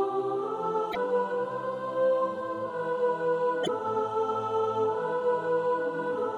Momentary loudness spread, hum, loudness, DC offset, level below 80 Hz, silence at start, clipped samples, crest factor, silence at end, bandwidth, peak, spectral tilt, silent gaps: 4 LU; none; -29 LUFS; under 0.1%; -74 dBFS; 0 s; under 0.1%; 12 dB; 0 s; 11 kHz; -16 dBFS; -6 dB/octave; none